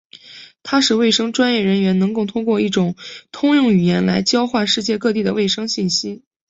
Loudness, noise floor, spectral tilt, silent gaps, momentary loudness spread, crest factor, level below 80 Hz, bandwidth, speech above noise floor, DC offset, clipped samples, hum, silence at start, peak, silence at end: -17 LUFS; -41 dBFS; -4.5 dB/octave; none; 7 LU; 14 dB; -56 dBFS; 8 kHz; 24 dB; under 0.1%; under 0.1%; none; 0.25 s; -4 dBFS; 0.3 s